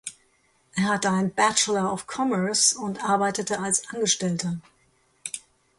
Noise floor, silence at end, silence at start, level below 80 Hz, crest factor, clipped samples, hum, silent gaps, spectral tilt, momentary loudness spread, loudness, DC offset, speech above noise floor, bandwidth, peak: -65 dBFS; 0.4 s; 0.05 s; -66 dBFS; 20 dB; under 0.1%; none; none; -3 dB/octave; 15 LU; -24 LUFS; under 0.1%; 40 dB; 11.5 kHz; -6 dBFS